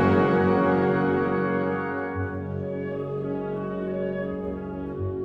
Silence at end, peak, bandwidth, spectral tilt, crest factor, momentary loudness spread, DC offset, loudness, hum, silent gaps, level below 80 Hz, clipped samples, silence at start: 0 s; -8 dBFS; 5.6 kHz; -9.5 dB/octave; 18 dB; 10 LU; under 0.1%; -26 LUFS; none; none; -52 dBFS; under 0.1%; 0 s